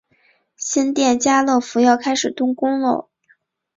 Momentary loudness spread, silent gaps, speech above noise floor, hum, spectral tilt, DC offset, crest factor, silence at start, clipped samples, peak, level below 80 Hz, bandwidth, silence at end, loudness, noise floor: 6 LU; none; 43 dB; none; -2.5 dB/octave; under 0.1%; 16 dB; 0.6 s; under 0.1%; -2 dBFS; -62 dBFS; 7.8 kHz; 0.75 s; -18 LUFS; -60 dBFS